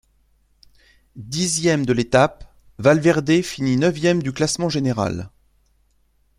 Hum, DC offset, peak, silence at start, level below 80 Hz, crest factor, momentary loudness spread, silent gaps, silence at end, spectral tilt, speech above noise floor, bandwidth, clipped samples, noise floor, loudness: none; under 0.1%; -2 dBFS; 1.15 s; -50 dBFS; 20 dB; 9 LU; none; 1.1 s; -5 dB/octave; 43 dB; 15 kHz; under 0.1%; -62 dBFS; -19 LUFS